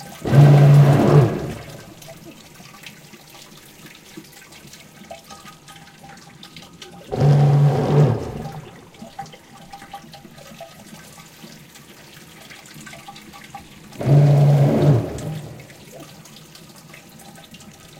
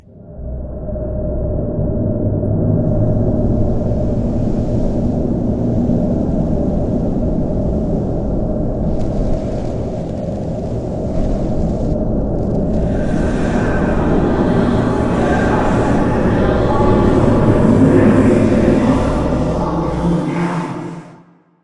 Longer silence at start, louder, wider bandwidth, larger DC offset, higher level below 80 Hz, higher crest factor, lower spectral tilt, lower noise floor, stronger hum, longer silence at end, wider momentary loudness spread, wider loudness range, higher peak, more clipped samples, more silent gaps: second, 0 s vs 0.15 s; about the same, -15 LUFS vs -16 LUFS; first, 14 kHz vs 11 kHz; neither; second, -48 dBFS vs -24 dBFS; first, 20 dB vs 14 dB; about the same, -8 dB/octave vs -8.5 dB/octave; about the same, -44 dBFS vs -45 dBFS; neither; first, 1.95 s vs 0.5 s; first, 28 LU vs 9 LU; first, 21 LU vs 7 LU; about the same, 0 dBFS vs 0 dBFS; neither; neither